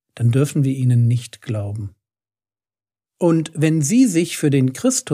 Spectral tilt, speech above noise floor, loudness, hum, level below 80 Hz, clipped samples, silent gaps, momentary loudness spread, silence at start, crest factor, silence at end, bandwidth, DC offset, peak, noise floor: -6 dB/octave; over 73 dB; -18 LUFS; none; -64 dBFS; under 0.1%; none; 11 LU; 0.15 s; 14 dB; 0 s; 15.5 kHz; under 0.1%; -4 dBFS; under -90 dBFS